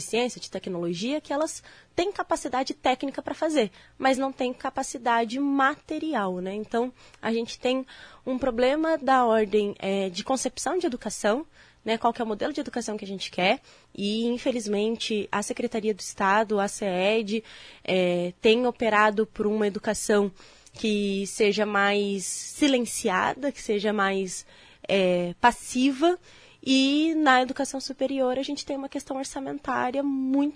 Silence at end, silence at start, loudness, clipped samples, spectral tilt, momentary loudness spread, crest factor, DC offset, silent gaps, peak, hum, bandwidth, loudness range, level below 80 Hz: 0 s; 0 s; -26 LUFS; under 0.1%; -4 dB/octave; 10 LU; 20 dB; under 0.1%; none; -6 dBFS; none; 11 kHz; 4 LU; -58 dBFS